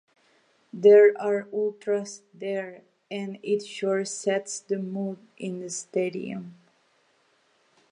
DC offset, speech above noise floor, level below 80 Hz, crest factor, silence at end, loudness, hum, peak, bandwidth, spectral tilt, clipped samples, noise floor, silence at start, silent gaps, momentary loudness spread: under 0.1%; 41 dB; -86 dBFS; 20 dB; 1.4 s; -25 LUFS; none; -6 dBFS; 10.5 kHz; -4.5 dB/octave; under 0.1%; -66 dBFS; 0.75 s; none; 20 LU